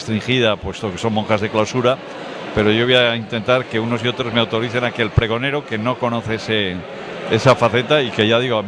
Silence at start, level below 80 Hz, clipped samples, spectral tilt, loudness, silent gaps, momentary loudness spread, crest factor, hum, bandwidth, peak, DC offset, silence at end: 0 s; -42 dBFS; under 0.1%; -5.5 dB/octave; -18 LUFS; none; 10 LU; 16 dB; none; 10.5 kHz; -2 dBFS; under 0.1%; 0 s